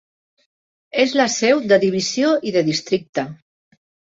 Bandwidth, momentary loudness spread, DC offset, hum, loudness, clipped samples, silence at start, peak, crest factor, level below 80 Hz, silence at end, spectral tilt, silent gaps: 8 kHz; 10 LU; under 0.1%; none; -18 LUFS; under 0.1%; 0.95 s; -2 dBFS; 18 dB; -64 dBFS; 0.8 s; -4 dB/octave; 3.09-3.13 s